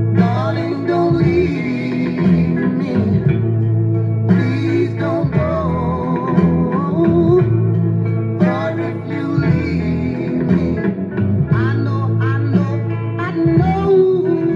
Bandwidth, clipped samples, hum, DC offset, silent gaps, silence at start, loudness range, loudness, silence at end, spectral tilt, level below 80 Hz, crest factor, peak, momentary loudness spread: 6.4 kHz; under 0.1%; none; under 0.1%; none; 0 s; 2 LU; -16 LUFS; 0 s; -10 dB/octave; -42 dBFS; 14 dB; -2 dBFS; 6 LU